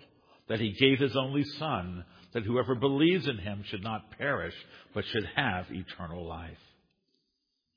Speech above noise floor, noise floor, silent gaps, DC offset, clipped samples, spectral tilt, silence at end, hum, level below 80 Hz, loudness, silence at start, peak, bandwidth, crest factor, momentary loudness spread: 50 dB; -81 dBFS; none; under 0.1%; under 0.1%; -7.5 dB/octave; 1.2 s; none; -60 dBFS; -31 LUFS; 0.5 s; -8 dBFS; 5.2 kHz; 24 dB; 16 LU